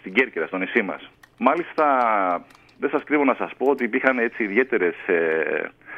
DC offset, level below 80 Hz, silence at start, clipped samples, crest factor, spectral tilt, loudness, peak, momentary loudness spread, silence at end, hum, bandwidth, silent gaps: under 0.1%; -66 dBFS; 0.05 s; under 0.1%; 20 dB; -7 dB/octave; -22 LUFS; -2 dBFS; 6 LU; 0 s; none; 6.6 kHz; none